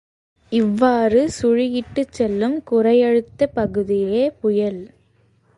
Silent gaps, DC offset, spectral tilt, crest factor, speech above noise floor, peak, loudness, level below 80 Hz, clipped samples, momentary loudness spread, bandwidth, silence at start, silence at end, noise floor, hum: none; under 0.1%; -6.5 dB/octave; 18 dB; 41 dB; -2 dBFS; -19 LUFS; -50 dBFS; under 0.1%; 7 LU; 11.5 kHz; 0.5 s; 0.7 s; -58 dBFS; none